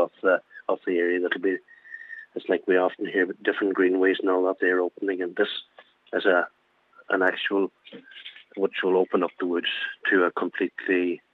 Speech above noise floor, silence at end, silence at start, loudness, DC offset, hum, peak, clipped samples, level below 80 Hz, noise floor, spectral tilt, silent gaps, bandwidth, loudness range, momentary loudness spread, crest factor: 33 dB; 0.15 s; 0 s; -25 LUFS; under 0.1%; none; -6 dBFS; under 0.1%; -88 dBFS; -58 dBFS; -6.5 dB/octave; none; 4.5 kHz; 3 LU; 13 LU; 18 dB